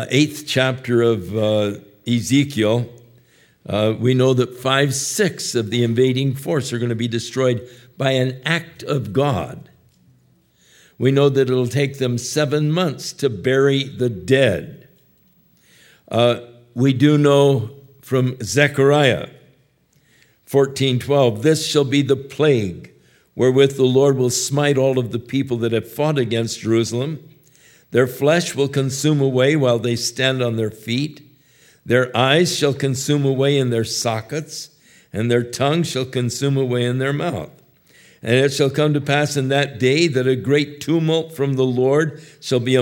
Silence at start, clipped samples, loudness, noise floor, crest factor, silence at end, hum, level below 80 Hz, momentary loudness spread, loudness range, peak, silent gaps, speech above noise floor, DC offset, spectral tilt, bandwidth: 0 s; under 0.1%; -18 LUFS; -59 dBFS; 18 dB; 0 s; none; -60 dBFS; 9 LU; 4 LU; 0 dBFS; none; 41 dB; under 0.1%; -5.5 dB/octave; 16.5 kHz